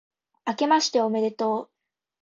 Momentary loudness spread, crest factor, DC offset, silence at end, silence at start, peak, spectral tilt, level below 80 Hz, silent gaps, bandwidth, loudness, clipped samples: 11 LU; 18 dB; under 0.1%; 0.6 s; 0.45 s; -8 dBFS; -3.5 dB/octave; -78 dBFS; none; 7.8 kHz; -24 LUFS; under 0.1%